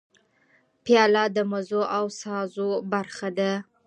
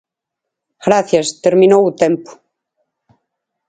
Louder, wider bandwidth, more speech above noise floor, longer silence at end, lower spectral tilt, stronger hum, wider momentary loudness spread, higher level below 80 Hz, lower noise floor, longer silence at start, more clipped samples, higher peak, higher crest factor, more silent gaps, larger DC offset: second, -25 LUFS vs -13 LUFS; about the same, 10 kHz vs 9.4 kHz; second, 40 dB vs 68 dB; second, 0.25 s vs 1.4 s; about the same, -5 dB/octave vs -5 dB/octave; neither; about the same, 11 LU vs 9 LU; second, -74 dBFS vs -60 dBFS; second, -64 dBFS vs -81 dBFS; about the same, 0.85 s vs 0.85 s; neither; second, -6 dBFS vs 0 dBFS; about the same, 20 dB vs 16 dB; neither; neither